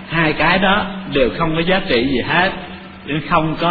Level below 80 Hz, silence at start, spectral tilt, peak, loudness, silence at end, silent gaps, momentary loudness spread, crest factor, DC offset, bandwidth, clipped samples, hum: -34 dBFS; 0 s; -8.5 dB/octave; 0 dBFS; -16 LUFS; 0 s; none; 10 LU; 16 dB; under 0.1%; 5 kHz; under 0.1%; none